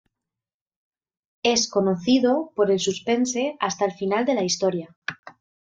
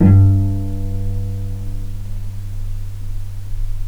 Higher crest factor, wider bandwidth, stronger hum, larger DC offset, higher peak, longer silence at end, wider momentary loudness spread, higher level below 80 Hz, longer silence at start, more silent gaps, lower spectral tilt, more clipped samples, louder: about the same, 18 dB vs 16 dB; first, 9.2 kHz vs 3.1 kHz; neither; neither; second, -8 dBFS vs 0 dBFS; first, 0.35 s vs 0 s; second, 6 LU vs 16 LU; second, -66 dBFS vs -24 dBFS; first, 1.45 s vs 0 s; first, 4.96-5.02 s, 5.19-5.23 s vs none; second, -4 dB/octave vs -9.5 dB/octave; neither; about the same, -22 LUFS vs -21 LUFS